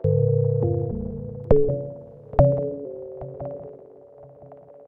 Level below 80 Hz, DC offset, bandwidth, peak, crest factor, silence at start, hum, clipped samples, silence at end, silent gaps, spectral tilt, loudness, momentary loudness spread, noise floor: -38 dBFS; under 0.1%; 2.7 kHz; -2 dBFS; 22 dB; 0 s; none; under 0.1%; 0.05 s; none; -13 dB/octave; -24 LUFS; 16 LU; -47 dBFS